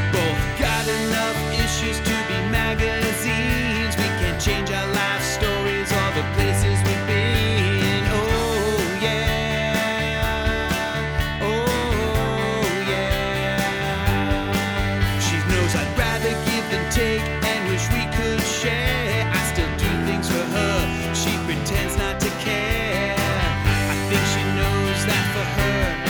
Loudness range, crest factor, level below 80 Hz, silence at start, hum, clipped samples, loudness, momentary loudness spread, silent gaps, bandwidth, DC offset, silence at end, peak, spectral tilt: 2 LU; 16 dB; -30 dBFS; 0 s; none; under 0.1%; -21 LUFS; 3 LU; none; over 20 kHz; under 0.1%; 0 s; -6 dBFS; -4.5 dB/octave